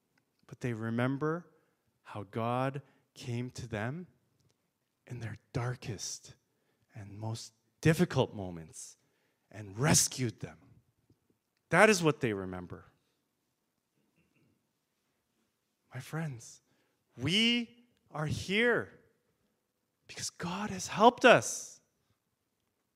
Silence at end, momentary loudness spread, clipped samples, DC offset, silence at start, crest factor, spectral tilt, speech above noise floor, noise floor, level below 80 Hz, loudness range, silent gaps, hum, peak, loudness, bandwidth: 1.2 s; 23 LU; under 0.1%; under 0.1%; 0.5 s; 28 dB; -4 dB/octave; 50 dB; -82 dBFS; -68 dBFS; 13 LU; none; none; -6 dBFS; -31 LUFS; 16 kHz